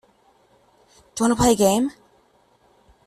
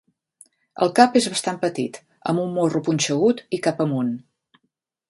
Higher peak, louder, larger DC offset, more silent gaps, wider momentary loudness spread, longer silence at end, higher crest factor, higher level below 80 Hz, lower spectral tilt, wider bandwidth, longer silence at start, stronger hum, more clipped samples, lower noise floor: second, -4 dBFS vs 0 dBFS; about the same, -19 LUFS vs -21 LUFS; neither; neither; about the same, 11 LU vs 13 LU; first, 1.15 s vs 0.9 s; about the same, 20 dB vs 22 dB; first, -46 dBFS vs -68 dBFS; about the same, -4.5 dB/octave vs -4.5 dB/octave; first, 13.5 kHz vs 11.5 kHz; first, 1.15 s vs 0.75 s; neither; neither; second, -60 dBFS vs -75 dBFS